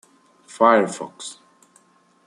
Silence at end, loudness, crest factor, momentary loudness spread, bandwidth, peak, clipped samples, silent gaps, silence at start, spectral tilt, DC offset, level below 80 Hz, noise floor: 0.95 s; -19 LUFS; 22 dB; 20 LU; 11.5 kHz; -2 dBFS; under 0.1%; none; 0.55 s; -4 dB/octave; under 0.1%; -74 dBFS; -58 dBFS